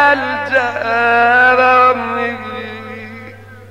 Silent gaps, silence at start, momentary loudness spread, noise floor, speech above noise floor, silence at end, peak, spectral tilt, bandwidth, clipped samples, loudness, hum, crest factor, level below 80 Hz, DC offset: none; 0 s; 20 LU; -35 dBFS; 22 dB; 0.05 s; 0 dBFS; -5 dB/octave; 12.5 kHz; under 0.1%; -12 LUFS; 50 Hz at -40 dBFS; 14 dB; -56 dBFS; 0.4%